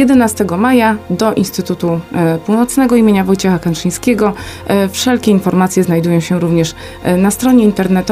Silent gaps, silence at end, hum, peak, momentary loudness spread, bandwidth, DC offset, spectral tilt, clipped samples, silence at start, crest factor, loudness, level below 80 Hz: none; 0 s; none; 0 dBFS; 6 LU; 16 kHz; under 0.1%; -6 dB/octave; under 0.1%; 0 s; 12 dB; -12 LUFS; -40 dBFS